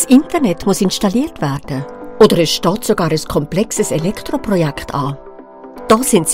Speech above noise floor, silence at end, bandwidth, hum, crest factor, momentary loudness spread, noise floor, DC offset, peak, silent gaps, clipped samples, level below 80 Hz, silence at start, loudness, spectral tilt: 21 dB; 0 s; 16.5 kHz; none; 14 dB; 13 LU; -35 dBFS; under 0.1%; 0 dBFS; none; 0.5%; -40 dBFS; 0 s; -15 LUFS; -5 dB/octave